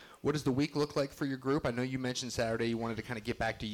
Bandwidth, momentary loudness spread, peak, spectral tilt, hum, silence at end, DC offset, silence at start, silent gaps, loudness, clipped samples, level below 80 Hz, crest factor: 17.5 kHz; 4 LU; -22 dBFS; -5.5 dB/octave; none; 0 s; under 0.1%; 0 s; none; -34 LUFS; under 0.1%; -58 dBFS; 12 dB